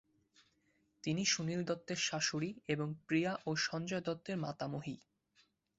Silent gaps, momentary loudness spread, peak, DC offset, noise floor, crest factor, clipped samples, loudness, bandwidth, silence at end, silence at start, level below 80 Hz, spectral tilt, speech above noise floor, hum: none; 8 LU; -18 dBFS; under 0.1%; -77 dBFS; 20 dB; under 0.1%; -38 LUFS; 8 kHz; 0.8 s; 1.05 s; -74 dBFS; -4 dB/octave; 39 dB; none